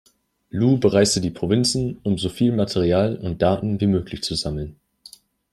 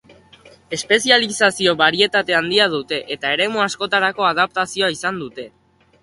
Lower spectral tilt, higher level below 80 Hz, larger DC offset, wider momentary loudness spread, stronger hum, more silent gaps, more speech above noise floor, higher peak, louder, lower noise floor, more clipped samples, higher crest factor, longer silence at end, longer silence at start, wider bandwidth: first, -5.5 dB/octave vs -2.5 dB/octave; first, -46 dBFS vs -60 dBFS; neither; second, 8 LU vs 13 LU; neither; neither; about the same, 28 dB vs 29 dB; second, -4 dBFS vs 0 dBFS; second, -21 LUFS vs -17 LUFS; about the same, -49 dBFS vs -48 dBFS; neither; about the same, 18 dB vs 20 dB; first, 0.8 s vs 0.55 s; second, 0.55 s vs 0.7 s; first, 13 kHz vs 11.5 kHz